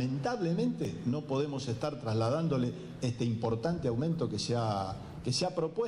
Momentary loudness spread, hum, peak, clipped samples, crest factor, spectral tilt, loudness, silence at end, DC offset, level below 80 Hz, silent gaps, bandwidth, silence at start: 5 LU; none; -20 dBFS; under 0.1%; 12 dB; -6.5 dB/octave; -33 LUFS; 0 s; under 0.1%; -58 dBFS; none; 11.5 kHz; 0 s